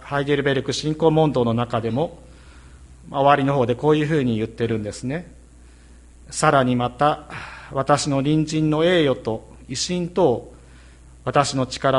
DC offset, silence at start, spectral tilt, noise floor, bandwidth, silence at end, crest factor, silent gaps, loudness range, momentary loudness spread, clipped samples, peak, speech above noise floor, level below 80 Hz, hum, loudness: under 0.1%; 0 s; -5.5 dB/octave; -46 dBFS; 11.5 kHz; 0 s; 20 dB; none; 3 LU; 12 LU; under 0.1%; 0 dBFS; 26 dB; -46 dBFS; none; -21 LUFS